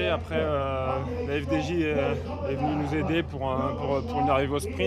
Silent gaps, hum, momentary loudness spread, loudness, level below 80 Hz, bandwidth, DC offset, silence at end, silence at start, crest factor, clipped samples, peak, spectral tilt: none; none; 5 LU; -27 LUFS; -42 dBFS; 13.5 kHz; under 0.1%; 0 s; 0 s; 16 dB; under 0.1%; -10 dBFS; -6.5 dB/octave